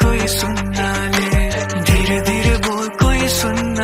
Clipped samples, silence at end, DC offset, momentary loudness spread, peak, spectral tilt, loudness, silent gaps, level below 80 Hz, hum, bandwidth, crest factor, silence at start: under 0.1%; 0 s; under 0.1%; 4 LU; -2 dBFS; -4.5 dB/octave; -17 LUFS; none; -22 dBFS; none; 16 kHz; 14 dB; 0 s